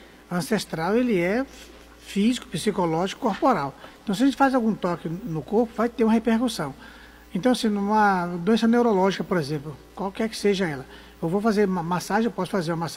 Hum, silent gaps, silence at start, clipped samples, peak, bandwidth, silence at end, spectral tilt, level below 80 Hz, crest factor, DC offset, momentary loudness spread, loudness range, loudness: none; none; 0 s; under 0.1%; -6 dBFS; 16 kHz; 0 s; -6 dB/octave; -52 dBFS; 18 dB; under 0.1%; 12 LU; 3 LU; -24 LUFS